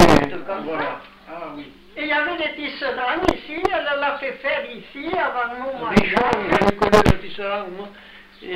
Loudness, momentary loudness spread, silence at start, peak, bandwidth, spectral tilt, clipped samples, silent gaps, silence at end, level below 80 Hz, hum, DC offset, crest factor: -21 LUFS; 19 LU; 0 s; -4 dBFS; 16 kHz; -5.5 dB/octave; under 0.1%; none; 0 s; -38 dBFS; none; under 0.1%; 16 dB